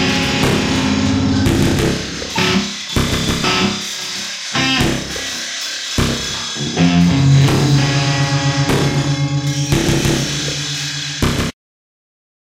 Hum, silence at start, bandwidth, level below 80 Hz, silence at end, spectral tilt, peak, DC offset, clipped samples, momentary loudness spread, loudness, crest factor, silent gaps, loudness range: none; 0 s; 16 kHz; -32 dBFS; 1 s; -4.5 dB/octave; -2 dBFS; under 0.1%; under 0.1%; 8 LU; -16 LUFS; 14 dB; none; 3 LU